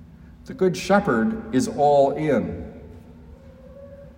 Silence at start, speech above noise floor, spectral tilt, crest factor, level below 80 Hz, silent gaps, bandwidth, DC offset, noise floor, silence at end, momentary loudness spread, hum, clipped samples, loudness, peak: 0 s; 24 dB; -6 dB/octave; 16 dB; -48 dBFS; none; 16 kHz; under 0.1%; -44 dBFS; 0.05 s; 23 LU; none; under 0.1%; -21 LUFS; -6 dBFS